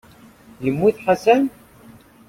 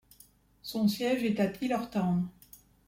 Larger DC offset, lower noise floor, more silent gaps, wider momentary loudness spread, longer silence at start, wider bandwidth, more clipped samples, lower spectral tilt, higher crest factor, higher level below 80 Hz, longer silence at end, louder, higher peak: neither; second, -47 dBFS vs -61 dBFS; neither; about the same, 10 LU vs 10 LU; about the same, 0.6 s vs 0.65 s; about the same, 16 kHz vs 16.5 kHz; neither; about the same, -6.5 dB/octave vs -6.5 dB/octave; about the same, 20 dB vs 16 dB; first, -56 dBFS vs -64 dBFS; first, 0.8 s vs 0.3 s; first, -19 LUFS vs -31 LUFS; first, 0 dBFS vs -16 dBFS